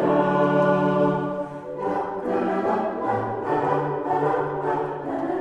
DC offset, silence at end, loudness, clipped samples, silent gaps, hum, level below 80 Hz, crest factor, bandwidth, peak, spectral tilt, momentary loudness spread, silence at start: under 0.1%; 0 s; -24 LUFS; under 0.1%; none; none; -58 dBFS; 16 dB; 9.4 kHz; -6 dBFS; -8.5 dB/octave; 8 LU; 0 s